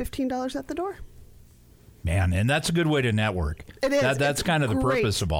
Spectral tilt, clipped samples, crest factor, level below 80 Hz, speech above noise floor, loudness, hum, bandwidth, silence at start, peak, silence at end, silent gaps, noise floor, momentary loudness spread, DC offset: -5.5 dB/octave; under 0.1%; 14 dB; -40 dBFS; 28 dB; -25 LUFS; none; 16.5 kHz; 0 s; -10 dBFS; 0 s; none; -52 dBFS; 9 LU; under 0.1%